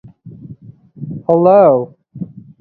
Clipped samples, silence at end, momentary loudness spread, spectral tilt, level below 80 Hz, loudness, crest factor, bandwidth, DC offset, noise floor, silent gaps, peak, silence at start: under 0.1%; 0.35 s; 22 LU; -12 dB/octave; -56 dBFS; -11 LUFS; 16 dB; 4.4 kHz; under 0.1%; -38 dBFS; none; 0 dBFS; 0.25 s